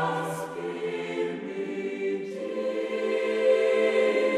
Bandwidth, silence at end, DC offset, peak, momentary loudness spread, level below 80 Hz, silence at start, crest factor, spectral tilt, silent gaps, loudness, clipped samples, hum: 13.5 kHz; 0 s; under 0.1%; -12 dBFS; 10 LU; -74 dBFS; 0 s; 14 dB; -5 dB/octave; none; -28 LUFS; under 0.1%; none